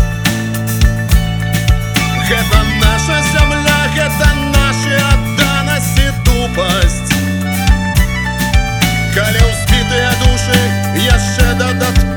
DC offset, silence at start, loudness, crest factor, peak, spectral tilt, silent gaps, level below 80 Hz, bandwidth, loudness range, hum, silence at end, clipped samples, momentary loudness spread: under 0.1%; 0 s; -12 LUFS; 12 dB; 0 dBFS; -4.5 dB/octave; none; -16 dBFS; over 20 kHz; 2 LU; none; 0 s; 0.2%; 3 LU